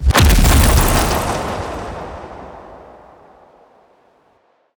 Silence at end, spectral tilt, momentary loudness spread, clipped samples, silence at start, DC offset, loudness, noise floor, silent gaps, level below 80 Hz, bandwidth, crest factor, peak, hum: 2 s; -4.5 dB/octave; 23 LU; under 0.1%; 0 s; under 0.1%; -15 LUFS; -57 dBFS; none; -20 dBFS; over 20 kHz; 16 dB; 0 dBFS; none